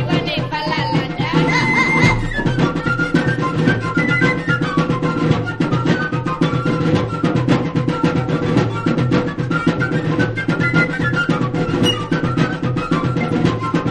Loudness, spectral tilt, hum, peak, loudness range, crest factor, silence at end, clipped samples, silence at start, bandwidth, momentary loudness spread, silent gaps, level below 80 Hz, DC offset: -17 LUFS; -6.5 dB/octave; none; 0 dBFS; 2 LU; 16 dB; 0 s; under 0.1%; 0 s; 10 kHz; 4 LU; none; -38 dBFS; under 0.1%